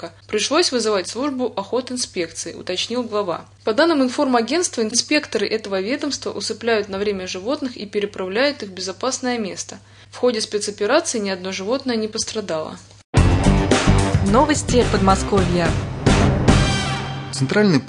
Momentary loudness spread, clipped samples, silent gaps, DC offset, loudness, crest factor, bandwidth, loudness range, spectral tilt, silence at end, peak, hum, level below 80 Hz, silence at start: 10 LU; under 0.1%; 13.04-13.13 s; under 0.1%; -20 LUFS; 18 dB; 11 kHz; 6 LU; -4.5 dB/octave; 0 s; -2 dBFS; none; -32 dBFS; 0 s